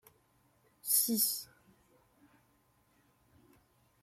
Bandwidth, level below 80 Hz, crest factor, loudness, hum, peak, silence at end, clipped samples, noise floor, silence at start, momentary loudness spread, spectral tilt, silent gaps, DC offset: 16.5 kHz; -80 dBFS; 26 dB; -31 LUFS; none; -14 dBFS; 2.6 s; under 0.1%; -72 dBFS; 0.85 s; 18 LU; -1.5 dB/octave; none; under 0.1%